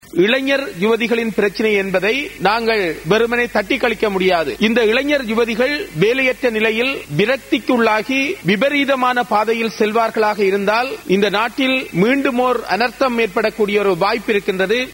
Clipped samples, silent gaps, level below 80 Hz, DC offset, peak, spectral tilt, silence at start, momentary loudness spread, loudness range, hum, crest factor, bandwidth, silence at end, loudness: under 0.1%; none; -48 dBFS; under 0.1%; -2 dBFS; -5 dB/octave; 0.15 s; 3 LU; 1 LU; none; 14 dB; 16.5 kHz; 0 s; -16 LUFS